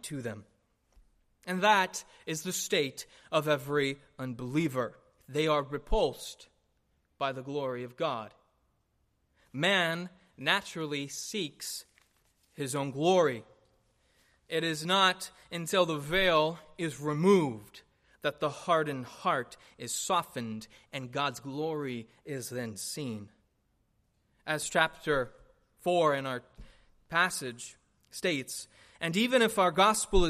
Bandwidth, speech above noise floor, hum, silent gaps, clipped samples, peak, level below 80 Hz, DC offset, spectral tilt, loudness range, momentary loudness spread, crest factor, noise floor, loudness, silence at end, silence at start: 15 kHz; 44 dB; none; none; under 0.1%; -10 dBFS; -48 dBFS; under 0.1%; -4 dB/octave; 6 LU; 16 LU; 22 dB; -74 dBFS; -31 LUFS; 0 s; 0.05 s